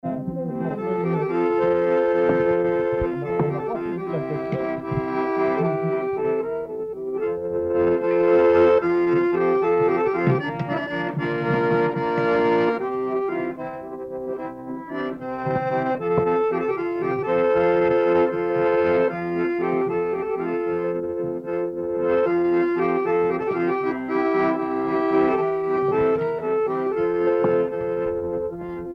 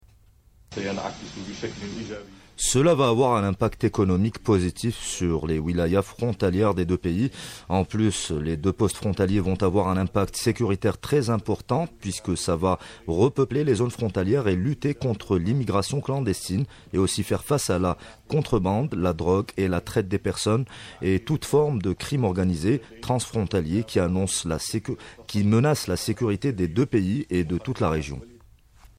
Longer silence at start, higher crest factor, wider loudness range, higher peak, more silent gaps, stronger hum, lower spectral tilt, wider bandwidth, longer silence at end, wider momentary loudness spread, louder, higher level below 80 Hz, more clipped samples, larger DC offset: second, 0.05 s vs 0.7 s; about the same, 14 dB vs 14 dB; first, 5 LU vs 2 LU; about the same, -8 dBFS vs -10 dBFS; neither; neither; first, -9 dB/octave vs -6 dB/octave; second, 5.8 kHz vs 16 kHz; second, 0 s vs 0.7 s; about the same, 9 LU vs 8 LU; first, -22 LUFS vs -25 LUFS; second, -52 dBFS vs -44 dBFS; neither; neither